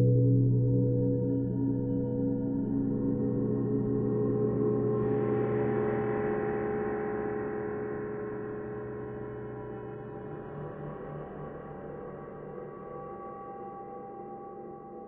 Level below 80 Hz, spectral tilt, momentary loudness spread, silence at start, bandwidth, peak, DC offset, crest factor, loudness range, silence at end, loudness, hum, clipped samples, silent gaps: -52 dBFS; -11 dB/octave; 15 LU; 0 s; 3.1 kHz; -16 dBFS; under 0.1%; 16 dB; 13 LU; 0 s; -31 LUFS; none; under 0.1%; none